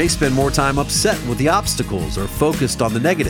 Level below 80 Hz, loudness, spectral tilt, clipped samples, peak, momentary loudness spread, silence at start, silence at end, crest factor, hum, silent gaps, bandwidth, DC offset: -30 dBFS; -18 LUFS; -4.5 dB/octave; under 0.1%; -2 dBFS; 5 LU; 0 s; 0 s; 16 dB; none; none; over 20 kHz; under 0.1%